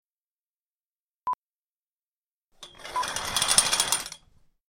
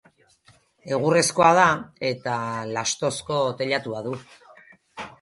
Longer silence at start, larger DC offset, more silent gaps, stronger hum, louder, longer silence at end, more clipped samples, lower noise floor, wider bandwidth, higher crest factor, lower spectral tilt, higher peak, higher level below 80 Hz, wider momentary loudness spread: first, 1.25 s vs 0.85 s; neither; first, 1.34-2.50 s vs none; neither; about the same, -24 LUFS vs -23 LUFS; first, 0.55 s vs 0.1 s; neither; first, under -90 dBFS vs -59 dBFS; first, 17 kHz vs 12 kHz; first, 30 dB vs 22 dB; second, 1 dB/octave vs -3.5 dB/octave; about the same, -2 dBFS vs -2 dBFS; about the same, -58 dBFS vs -62 dBFS; about the same, 17 LU vs 17 LU